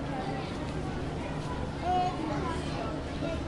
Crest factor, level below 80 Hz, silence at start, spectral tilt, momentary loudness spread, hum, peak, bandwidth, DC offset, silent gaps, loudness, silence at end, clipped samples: 16 dB; -44 dBFS; 0 s; -6.5 dB/octave; 6 LU; none; -18 dBFS; 11.5 kHz; under 0.1%; none; -33 LUFS; 0 s; under 0.1%